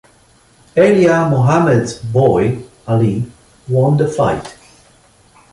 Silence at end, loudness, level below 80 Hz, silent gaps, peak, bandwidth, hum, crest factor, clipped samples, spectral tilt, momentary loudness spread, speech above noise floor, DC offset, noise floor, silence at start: 1 s; -14 LUFS; -44 dBFS; none; -2 dBFS; 11.5 kHz; none; 14 dB; under 0.1%; -7.5 dB/octave; 12 LU; 37 dB; under 0.1%; -50 dBFS; 0.75 s